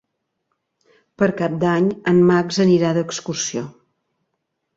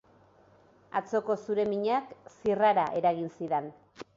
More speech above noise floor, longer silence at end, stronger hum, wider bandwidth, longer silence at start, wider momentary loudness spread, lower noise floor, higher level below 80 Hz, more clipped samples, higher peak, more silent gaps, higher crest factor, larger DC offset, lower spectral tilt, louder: first, 58 dB vs 32 dB; first, 1.05 s vs 0.15 s; neither; about the same, 7.8 kHz vs 7.6 kHz; first, 1.2 s vs 0.95 s; about the same, 10 LU vs 10 LU; first, -75 dBFS vs -61 dBFS; first, -60 dBFS vs -70 dBFS; neither; first, -4 dBFS vs -14 dBFS; neither; about the same, 16 dB vs 16 dB; neither; about the same, -5.5 dB/octave vs -6.5 dB/octave; first, -18 LUFS vs -29 LUFS